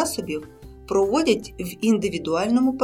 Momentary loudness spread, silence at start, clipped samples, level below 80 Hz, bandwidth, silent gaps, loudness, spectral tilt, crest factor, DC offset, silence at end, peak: 11 LU; 0 s; under 0.1%; -48 dBFS; 17 kHz; none; -23 LUFS; -5 dB/octave; 16 dB; under 0.1%; 0 s; -6 dBFS